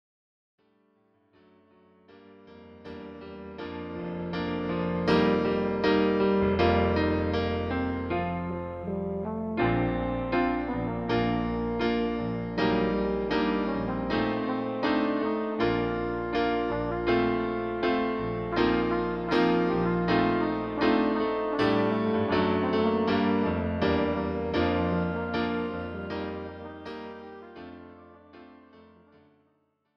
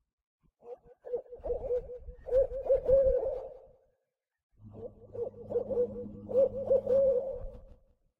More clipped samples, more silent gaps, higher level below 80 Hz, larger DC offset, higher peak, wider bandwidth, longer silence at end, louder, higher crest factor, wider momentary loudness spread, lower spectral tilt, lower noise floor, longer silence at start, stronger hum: neither; second, none vs 4.43-4.50 s; about the same, -46 dBFS vs -48 dBFS; neither; first, -10 dBFS vs -14 dBFS; first, 6.6 kHz vs 2.8 kHz; first, 1.15 s vs 0.6 s; first, -27 LUFS vs -31 LUFS; about the same, 18 dB vs 18 dB; second, 13 LU vs 22 LU; second, -8 dB/octave vs -9.5 dB/octave; second, -72 dBFS vs -83 dBFS; first, 2.1 s vs 0.65 s; neither